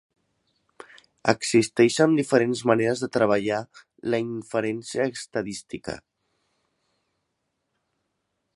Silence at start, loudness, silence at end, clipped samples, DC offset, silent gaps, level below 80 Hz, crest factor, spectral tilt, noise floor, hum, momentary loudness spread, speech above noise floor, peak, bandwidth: 1.25 s; -24 LUFS; 2.55 s; under 0.1%; under 0.1%; none; -64 dBFS; 24 dB; -5 dB/octave; -78 dBFS; none; 15 LU; 54 dB; -2 dBFS; 11.5 kHz